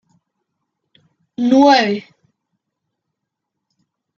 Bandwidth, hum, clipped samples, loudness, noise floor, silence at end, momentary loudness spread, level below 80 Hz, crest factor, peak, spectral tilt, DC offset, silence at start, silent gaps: 7.2 kHz; none; under 0.1%; -14 LUFS; -79 dBFS; 2.15 s; 16 LU; -66 dBFS; 18 dB; -2 dBFS; -4.5 dB/octave; under 0.1%; 1.4 s; none